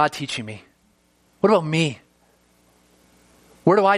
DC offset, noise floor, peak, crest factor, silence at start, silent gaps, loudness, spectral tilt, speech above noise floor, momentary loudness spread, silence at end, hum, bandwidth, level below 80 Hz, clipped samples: under 0.1%; -62 dBFS; -2 dBFS; 22 dB; 0 s; none; -21 LUFS; -5.5 dB/octave; 43 dB; 20 LU; 0 s; none; 14 kHz; -64 dBFS; under 0.1%